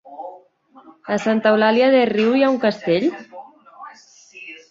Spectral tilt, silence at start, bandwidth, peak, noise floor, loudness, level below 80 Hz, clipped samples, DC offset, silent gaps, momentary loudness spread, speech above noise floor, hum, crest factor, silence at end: -6 dB/octave; 0.05 s; 7.8 kHz; -2 dBFS; -50 dBFS; -17 LUFS; -66 dBFS; under 0.1%; under 0.1%; none; 25 LU; 33 dB; none; 18 dB; 0.15 s